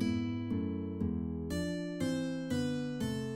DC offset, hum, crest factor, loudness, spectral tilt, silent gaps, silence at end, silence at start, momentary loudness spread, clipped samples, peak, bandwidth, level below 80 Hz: under 0.1%; none; 14 dB; -36 LUFS; -6.5 dB/octave; none; 0 s; 0 s; 3 LU; under 0.1%; -22 dBFS; 16 kHz; -58 dBFS